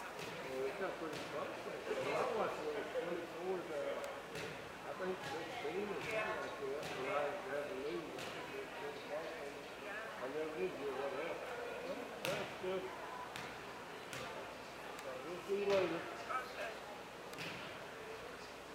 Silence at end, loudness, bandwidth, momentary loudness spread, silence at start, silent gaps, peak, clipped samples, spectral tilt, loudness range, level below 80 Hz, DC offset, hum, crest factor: 0 s; -43 LUFS; 16 kHz; 9 LU; 0 s; none; -18 dBFS; under 0.1%; -4 dB/octave; 3 LU; -72 dBFS; under 0.1%; none; 24 dB